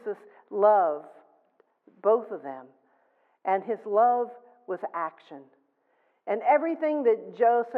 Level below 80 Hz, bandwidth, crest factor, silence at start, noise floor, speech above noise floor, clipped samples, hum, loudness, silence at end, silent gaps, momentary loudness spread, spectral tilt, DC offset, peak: under -90 dBFS; 4.5 kHz; 18 dB; 0.05 s; -70 dBFS; 45 dB; under 0.1%; none; -26 LUFS; 0 s; none; 15 LU; -8.5 dB/octave; under 0.1%; -8 dBFS